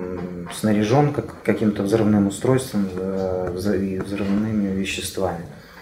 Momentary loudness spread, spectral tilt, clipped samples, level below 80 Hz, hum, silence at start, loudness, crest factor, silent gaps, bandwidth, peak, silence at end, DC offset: 8 LU; -6.5 dB/octave; under 0.1%; -48 dBFS; none; 0 s; -22 LUFS; 18 dB; none; 16 kHz; -4 dBFS; 0 s; under 0.1%